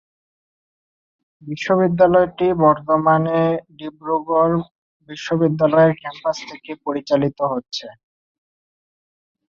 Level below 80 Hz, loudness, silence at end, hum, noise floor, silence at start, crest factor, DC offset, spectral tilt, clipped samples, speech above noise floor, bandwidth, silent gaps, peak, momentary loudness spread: -56 dBFS; -18 LUFS; 1.6 s; none; under -90 dBFS; 1.45 s; 18 dB; under 0.1%; -7 dB/octave; under 0.1%; over 72 dB; 7.4 kHz; 4.71-5.00 s; -2 dBFS; 16 LU